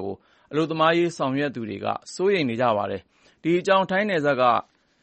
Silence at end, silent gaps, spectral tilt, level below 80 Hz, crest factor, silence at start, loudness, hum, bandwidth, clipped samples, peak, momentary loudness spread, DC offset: 0.4 s; none; -5.5 dB/octave; -66 dBFS; 16 dB; 0 s; -23 LUFS; none; 8.4 kHz; under 0.1%; -6 dBFS; 10 LU; under 0.1%